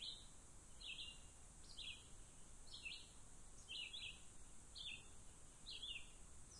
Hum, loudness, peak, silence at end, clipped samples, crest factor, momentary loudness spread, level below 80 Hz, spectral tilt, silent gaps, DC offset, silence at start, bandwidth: none; -55 LUFS; -40 dBFS; 0 s; under 0.1%; 16 dB; 12 LU; -66 dBFS; -1 dB/octave; none; under 0.1%; 0 s; 11.5 kHz